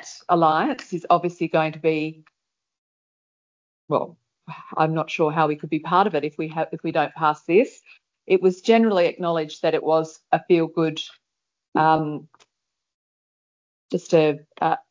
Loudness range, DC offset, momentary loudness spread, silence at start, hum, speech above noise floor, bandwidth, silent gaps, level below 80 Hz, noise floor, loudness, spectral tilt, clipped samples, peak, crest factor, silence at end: 6 LU; under 0.1%; 11 LU; 0.05 s; none; 60 dB; 7.6 kHz; 2.78-3.88 s, 11.68-11.72 s, 12.94-13.89 s; -74 dBFS; -82 dBFS; -22 LUFS; -6.5 dB/octave; under 0.1%; -4 dBFS; 20 dB; 0.1 s